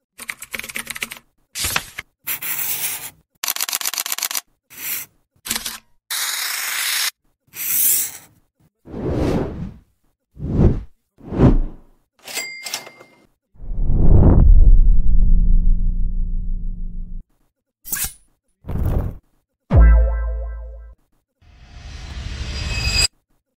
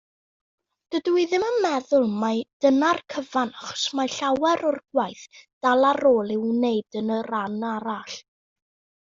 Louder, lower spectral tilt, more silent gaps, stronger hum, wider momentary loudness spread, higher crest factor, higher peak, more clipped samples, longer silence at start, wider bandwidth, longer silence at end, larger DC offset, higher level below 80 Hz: first, -20 LUFS vs -23 LUFS; about the same, -4 dB/octave vs -4.5 dB/octave; second, 3.38-3.42 s vs 2.53-2.60 s, 5.53-5.61 s; neither; first, 21 LU vs 10 LU; about the same, 16 dB vs 16 dB; first, 0 dBFS vs -8 dBFS; neither; second, 0.2 s vs 0.9 s; first, 16.5 kHz vs 7.6 kHz; second, 0.5 s vs 0.9 s; neither; first, -20 dBFS vs -68 dBFS